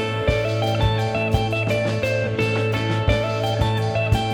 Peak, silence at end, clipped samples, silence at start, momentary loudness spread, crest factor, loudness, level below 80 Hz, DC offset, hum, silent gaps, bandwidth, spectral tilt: -6 dBFS; 0 s; under 0.1%; 0 s; 1 LU; 16 dB; -21 LUFS; -32 dBFS; under 0.1%; none; none; 13.5 kHz; -6 dB/octave